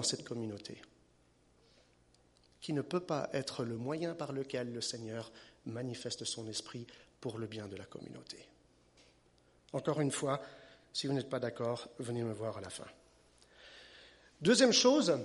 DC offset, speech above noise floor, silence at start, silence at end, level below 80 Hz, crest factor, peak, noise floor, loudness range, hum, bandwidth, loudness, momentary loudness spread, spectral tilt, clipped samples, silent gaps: under 0.1%; 33 dB; 0 s; 0 s; -74 dBFS; 24 dB; -14 dBFS; -69 dBFS; 6 LU; 60 Hz at -70 dBFS; 11.5 kHz; -36 LUFS; 22 LU; -4 dB/octave; under 0.1%; none